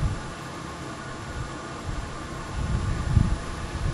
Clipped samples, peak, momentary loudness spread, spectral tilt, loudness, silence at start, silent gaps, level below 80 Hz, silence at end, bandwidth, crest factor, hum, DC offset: under 0.1%; -6 dBFS; 11 LU; -6 dB/octave; -31 LUFS; 0 s; none; -32 dBFS; 0 s; 12.5 kHz; 22 dB; none; under 0.1%